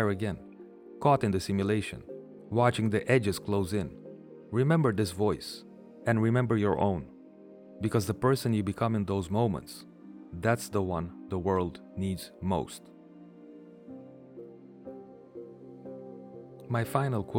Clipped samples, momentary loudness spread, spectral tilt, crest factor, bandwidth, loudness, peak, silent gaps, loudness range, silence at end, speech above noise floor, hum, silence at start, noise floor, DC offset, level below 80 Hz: under 0.1%; 22 LU; -6.5 dB/octave; 20 dB; 17.5 kHz; -30 LUFS; -10 dBFS; none; 12 LU; 0 s; 23 dB; none; 0 s; -51 dBFS; under 0.1%; -60 dBFS